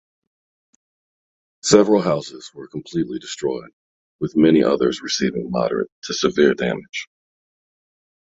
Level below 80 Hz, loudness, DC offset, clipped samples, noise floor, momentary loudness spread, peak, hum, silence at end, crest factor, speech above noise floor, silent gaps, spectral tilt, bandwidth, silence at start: -56 dBFS; -19 LUFS; under 0.1%; under 0.1%; under -90 dBFS; 16 LU; 0 dBFS; none; 1.25 s; 20 dB; over 71 dB; 3.73-4.19 s, 5.92-6.02 s, 6.89-6.93 s; -4.5 dB/octave; 8.4 kHz; 1.65 s